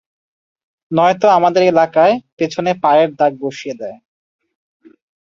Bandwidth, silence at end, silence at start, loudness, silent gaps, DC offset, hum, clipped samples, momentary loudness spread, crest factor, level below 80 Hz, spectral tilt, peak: 7.4 kHz; 1.25 s; 0.9 s; -14 LUFS; 2.32-2.37 s; under 0.1%; none; under 0.1%; 14 LU; 14 dB; -62 dBFS; -6 dB/octave; -2 dBFS